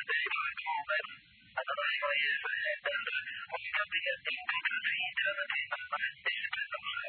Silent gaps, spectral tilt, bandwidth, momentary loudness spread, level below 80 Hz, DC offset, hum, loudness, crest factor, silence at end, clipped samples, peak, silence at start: none; -3 dB/octave; 4.6 kHz; 6 LU; -78 dBFS; under 0.1%; none; -33 LUFS; 18 dB; 0 s; under 0.1%; -18 dBFS; 0 s